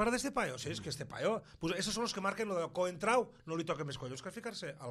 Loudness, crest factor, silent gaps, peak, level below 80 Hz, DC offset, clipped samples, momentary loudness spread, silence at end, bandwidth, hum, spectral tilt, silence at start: -37 LUFS; 20 dB; none; -18 dBFS; -62 dBFS; under 0.1%; under 0.1%; 10 LU; 0 s; 14 kHz; none; -4 dB/octave; 0 s